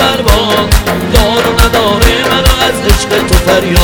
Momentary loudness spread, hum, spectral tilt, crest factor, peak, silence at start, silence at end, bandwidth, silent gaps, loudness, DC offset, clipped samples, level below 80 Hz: 2 LU; none; -4 dB/octave; 8 dB; 0 dBFS; 0 s; 0 s; over 20 kHz; none; -9 LUFS; under 0.1%; 2%; -14 dBFS